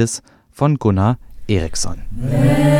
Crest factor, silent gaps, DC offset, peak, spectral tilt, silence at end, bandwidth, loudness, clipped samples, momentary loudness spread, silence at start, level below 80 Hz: 14 dB; none; under 0.1%; -2 dBFS; -6 dB/octave; 0 s; 15 kHz; -18 LUFS; under 0.1%; 11 LU; 0 s; -32 dBFS